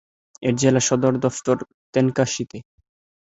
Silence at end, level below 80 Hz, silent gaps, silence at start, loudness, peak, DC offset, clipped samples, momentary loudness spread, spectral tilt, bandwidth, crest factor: 0.6 s; -56 dBFS; 1.74-1.93 s; 0.4 s; -21 LUFS; -2 dBFS; under 0.1%; under 0.1%; 10 LU; -5 dB/octave; 8.4 kHz; 20 dB